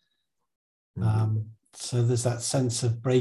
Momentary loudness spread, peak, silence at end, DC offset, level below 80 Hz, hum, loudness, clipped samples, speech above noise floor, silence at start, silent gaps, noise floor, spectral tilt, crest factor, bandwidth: 12 LU; -12 dBFS; 0 s; under 0.1%; -54 dBFS; none; -27 LUFS; under 0.1%; 54 dB; 0.95 s; none; -79 dBFS; -5.5 dB/octave; 16 dB; 12.5 kHz